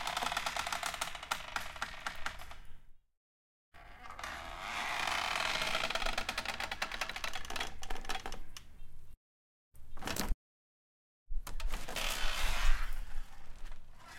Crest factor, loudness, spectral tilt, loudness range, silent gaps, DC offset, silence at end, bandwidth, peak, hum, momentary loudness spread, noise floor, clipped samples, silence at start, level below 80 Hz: 22 dB; -38 LUFS; -2 dB/octave; 9 LU; 3.17-3.72 s, 9.17-9.72 s, 10.34-11.26 s; under 0.1%; 0 s; 17 kHz; -14 dBFS; none; 20 LU; under -90 dBFS; under 0.1%; 0 s; -42 dBFS